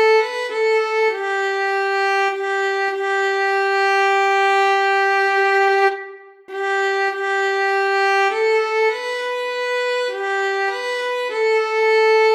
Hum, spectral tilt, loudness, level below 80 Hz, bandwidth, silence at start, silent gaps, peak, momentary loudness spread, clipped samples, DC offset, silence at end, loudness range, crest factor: none; 0.5 dB/octave; -18 LUFS; under -90 dBFS; 12.5 kHz; 0 s; none; -4 dBFS; 7 LU; under 0.1%; under 0.1%; 0 s; 3 LU; 14 dB